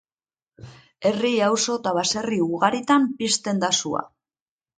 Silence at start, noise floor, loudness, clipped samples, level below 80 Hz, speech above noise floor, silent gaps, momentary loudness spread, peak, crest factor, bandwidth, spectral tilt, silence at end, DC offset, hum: 0.6 s; under -90 dBFS; -22 LUFS; under 0.1%; -64 dBFS; over 68 dB; none; 5 LU; -4 dBFS; 20 dB; 9.6 kHz; -3 dB/octave; 0.7 s; under 0.1%; none